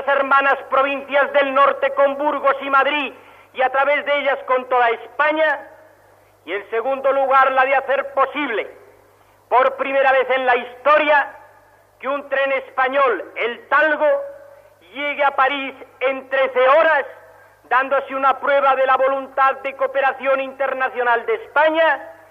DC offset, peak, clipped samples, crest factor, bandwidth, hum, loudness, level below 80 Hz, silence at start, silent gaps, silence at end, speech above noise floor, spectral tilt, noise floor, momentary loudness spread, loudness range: under 0.1%; -4 dBFS; under 0.1%; 14 dB; 5.6 kHz; 50 Hz at -65 dBFS; -18 LUFS; -66 dBFS; 0 s; none; 0.2 s; 35 dB; -4 dB/octave; -53 dBFS; 9 LU; 3 LU